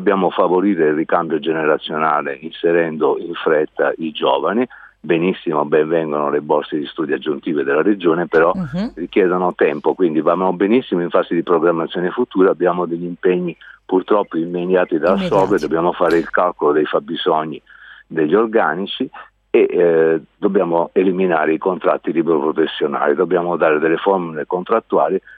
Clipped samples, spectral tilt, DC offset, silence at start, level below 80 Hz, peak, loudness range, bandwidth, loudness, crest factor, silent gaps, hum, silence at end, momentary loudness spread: under 0.1%; -7.5 dB/octave; under 0.1%; 0 s; -56 dBFS; 0 dBFS; 2 LU; 7.6 kHz; -17 LUFS; 16 dB; none; none; 0.05 s; 6 LU